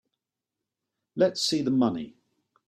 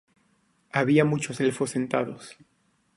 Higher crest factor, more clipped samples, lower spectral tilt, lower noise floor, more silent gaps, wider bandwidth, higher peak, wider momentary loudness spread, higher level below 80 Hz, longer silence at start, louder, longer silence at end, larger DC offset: about the same, 18 dB vs 20 dB; neither; second, -4.5 dB/octave vs -6 dB/octave; first, -87 dBFS vs -67 dBFS; neither; first, 14 kHz vs 11.5 kHz; second, -10 dBFS vs -6 dBFS; about the same, 16 LU vs 15 LU; about the same, -68 dBFS vs -66 dBFS; first, 1.15 s vs 0.75 s; about the same, -25 LUFS vs -25 LUFS; about the same, 0.6 s vs 0.65 s; neither